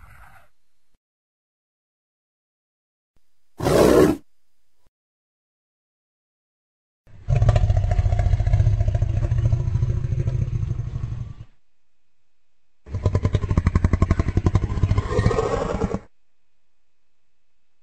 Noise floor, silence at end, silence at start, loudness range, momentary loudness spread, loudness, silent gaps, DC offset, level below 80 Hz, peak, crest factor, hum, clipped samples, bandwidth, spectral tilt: -77 dBFS; 1.8 s; 3.6 s; 6 LU; 11 LU; -22 LUFS; 4.88-7.04 s; 0.4%; -30 dBFS; -2 dBFS; 20 dB; none; under 0.1%; 15 kHz; -7.5 dB/octave